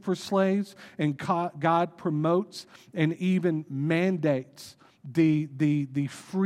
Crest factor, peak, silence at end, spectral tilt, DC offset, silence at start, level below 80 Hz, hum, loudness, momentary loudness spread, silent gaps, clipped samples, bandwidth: 18 dB; -10 dBFS; 0 s; -7.5 dB/octave; under 0.1%; 0.05 s; -72 dBFS; none; -27 LUFS; 13 LU; none; under 0.1%; 13.5 kHz